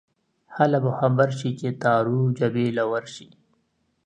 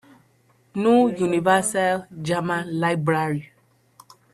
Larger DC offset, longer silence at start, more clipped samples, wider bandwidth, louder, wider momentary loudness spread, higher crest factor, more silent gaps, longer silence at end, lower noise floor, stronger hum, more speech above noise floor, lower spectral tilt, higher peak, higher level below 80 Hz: neither; second, 0.5 s vs 0.75 s; neither; second, 9.4 kHz vs 13 kHz; about the same, -23 LUFS vs -22 LUFS; about the same, 10 LU vs 9 LU; about the same, 20 dB vs 20 dB; neither; about the same, 0.8 s vs 0.9 s; first, -70 dBFS vs -60 dBFS; neither; first, 48 dB vs 39 dB; first, -7.5 dB/octave vs -5.5 dB/octave; about the same, -4 dBFS vs -4 dBFS; about the same, -66 dBFS vs -64 dBFS